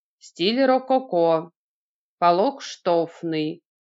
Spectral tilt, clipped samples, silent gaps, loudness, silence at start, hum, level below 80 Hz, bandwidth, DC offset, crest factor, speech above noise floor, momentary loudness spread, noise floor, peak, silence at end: -5.5 dB/octave; under 0.1%; 1.56-2.18 s; -22 LUFS; 0.25 s; none; under -90 dBFS; 7.8 kHz; under 0.1%; 18 dB; over 69 dB; 8 LU; under -90 dBFS; -6 dBFS; 0.25 s